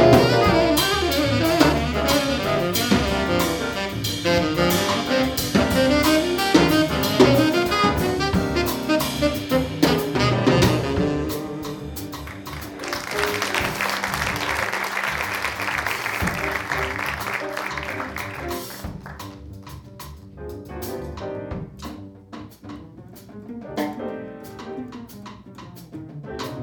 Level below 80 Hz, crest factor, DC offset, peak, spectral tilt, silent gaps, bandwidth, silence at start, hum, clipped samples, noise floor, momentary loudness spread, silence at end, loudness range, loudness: -38 dBFS; 22 dB; under 0.1%; -2 dBFS; -4.5 dB/octave; none; over 20 kHz; 0 s; none; under 0.1%; -42 dBFS; 21 LU; 0 s; 16 LU; -21 LUFS